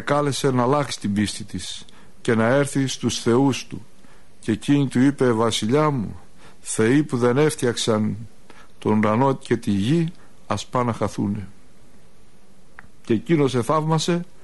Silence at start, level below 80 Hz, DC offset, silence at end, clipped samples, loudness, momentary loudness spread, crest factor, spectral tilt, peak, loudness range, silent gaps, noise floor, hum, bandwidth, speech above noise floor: 0 s; -54 dBFS; 1%; 0.2 s; under 0.1%; -21 LUFS; 12 LU; 16 dB; -5.5 dB/octave; -6 dBFS; 5 LU; none; -53 dBFS; none; 11.5 kHz; 33 dB